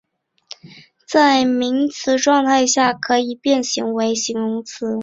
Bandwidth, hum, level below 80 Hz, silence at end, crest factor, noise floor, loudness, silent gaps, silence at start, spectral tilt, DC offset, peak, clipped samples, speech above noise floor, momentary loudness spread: 7.8 kHz; none; -62 dBFS; 0 s; 16 dB; -43 dBFS; -17 LUFS; none; 0.65 s; -2.5 dB/octave; under 0.1%; -2 dBFS; under 0.1%; 25 dB; 11 LU